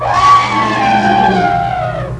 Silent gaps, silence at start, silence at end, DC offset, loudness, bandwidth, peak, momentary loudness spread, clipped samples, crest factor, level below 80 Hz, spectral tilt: none; 0 s; 0 s; under 0.1%; -11 LUFS; 11 kHz; 0 dBFS; 7 LU; under 0.1%; 12 dB; -34 dBFS; -5 dB/octave